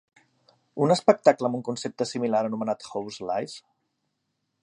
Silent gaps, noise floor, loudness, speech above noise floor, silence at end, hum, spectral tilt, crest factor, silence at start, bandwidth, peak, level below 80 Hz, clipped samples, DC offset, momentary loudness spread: none; -78 dBFS; -25 LUFS; 53 dB; 1.05 s; none; -5.5 dB/octave; 24 dB; 0.75 s; 11.5 kHz; -2 dBFS; -72 dBFS; under 0.1%; under 0.1%; 14 LU